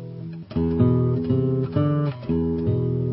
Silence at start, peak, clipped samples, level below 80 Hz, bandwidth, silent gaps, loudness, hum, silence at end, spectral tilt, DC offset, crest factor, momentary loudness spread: 0 s; -6 dBFS; under 0.1%; -38 dBFS; 5.6 kHz; none; -23 LUFS; none; 0 s; -14 dB/octave; under 0.1%; 16 dB; 8 LU